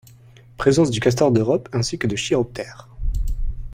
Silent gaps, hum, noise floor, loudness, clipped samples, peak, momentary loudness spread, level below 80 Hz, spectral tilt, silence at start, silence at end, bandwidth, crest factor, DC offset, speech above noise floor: none; none; -47 dBFS; -20 LUFS; under 0.1%; -2 dBFS; 14 LU; -30 dBFS; -5.5 dB/octave; 0.6 s; 0 s; 16 kHz; 18 dB; under 0.1%; 28 dB